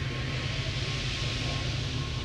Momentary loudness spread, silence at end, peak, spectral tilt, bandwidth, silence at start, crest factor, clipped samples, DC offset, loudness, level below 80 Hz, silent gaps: 2 LU; 0 s; -18 dBFS; -4.5 dB/octave; 11.5 kHz; 0 s; 12 dB; under 0.1%; under 0.1%; -31 LUFS; -40 dBFS; none